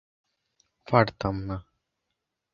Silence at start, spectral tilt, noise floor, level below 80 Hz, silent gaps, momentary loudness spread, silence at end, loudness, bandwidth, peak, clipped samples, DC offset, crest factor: 0.9 s; -8 dB/octave; -83 dBFS; -50 dBFS; none; 14 LU; 0.95 s; -26 LUFS; 7 kHz; -4 dBFS; under 0.1%; under 0.1%; 28 dB